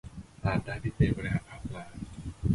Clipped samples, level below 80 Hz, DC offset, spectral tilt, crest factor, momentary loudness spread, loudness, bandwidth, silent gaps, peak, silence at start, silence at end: under 0.1%; -42 dBFS; under 0.1%; -8 dB/octave; 20 dB; 14 LU; -33 LUFS; 11.5 kHz; none; -12 dBFS; 0.05 s; 0 s